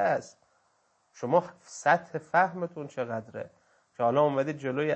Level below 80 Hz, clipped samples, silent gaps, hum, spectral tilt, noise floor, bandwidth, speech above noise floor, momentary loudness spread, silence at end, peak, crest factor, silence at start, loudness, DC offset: -78 dBFS; under 0.1%; none; none; -6 dB/octave; -70 dBFS; 8.6 kHz; 42 dB; 15 LU; 0 s; -8 dBFS; 20 dB; 0 s; -28 LUFS; under 0.1%